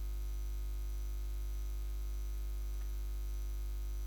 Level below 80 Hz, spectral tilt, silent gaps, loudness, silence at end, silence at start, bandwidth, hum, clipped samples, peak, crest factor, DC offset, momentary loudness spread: -38 dBFS; -5.5 dB/octave; none; -43 LUFS; 0 s; 0 s; 19.5 kHz; 50 Hz at -40 dBFS; under 0.1%; -34 dBFS; 6 dB; under 0.1%; 0 LU